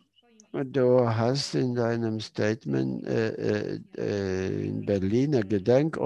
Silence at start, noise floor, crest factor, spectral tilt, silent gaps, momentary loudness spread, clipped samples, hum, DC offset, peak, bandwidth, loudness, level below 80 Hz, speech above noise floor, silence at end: 0.55 s; -60 dBFS; 18 dB; -7 dB/octave; none; 8 LU; under 0.1%; none; under 0.1%; -8 dBFS; 11.5 kHz; -27 LUFS; -56 dBFS; 34 dB; 0 s